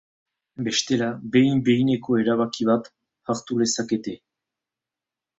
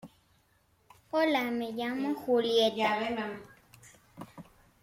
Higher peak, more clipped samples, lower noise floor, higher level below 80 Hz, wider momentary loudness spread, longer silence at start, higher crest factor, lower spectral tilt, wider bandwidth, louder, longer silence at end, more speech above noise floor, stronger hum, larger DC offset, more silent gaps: first, -6 dBFS vs -14 dBFS; neither; first, -89 dBFS vs -69 dBFS; first, -62 dBFS vs -70 dBFS; second, 11 LU vs 22 LU; first, 0.6 s vs 0.05 s; about the same, 18 dB vs 18 dB; about the same, -5 dB/octave vs -4.5 dB/octave; second, 8 kHz vs 16.5 kHz; first, -23 LUFS vs -30 LUFS; first, 1.25 s vs 0.4 s; first, 67 dB vs 39 dB; neither; neither; neither